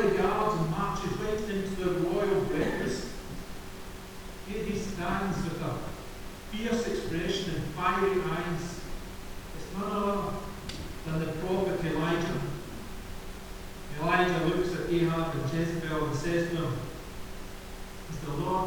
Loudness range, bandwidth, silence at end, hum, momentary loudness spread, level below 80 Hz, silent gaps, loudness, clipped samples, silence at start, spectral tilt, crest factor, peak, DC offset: 5 LU; over 20 kHz; 0 s; none; 16 LU; -44 dBFS; none; -31 LUFS; under 0.1%; 0 s; -6 dB/octave; 20 dB; -10 dBFS; under 0.1%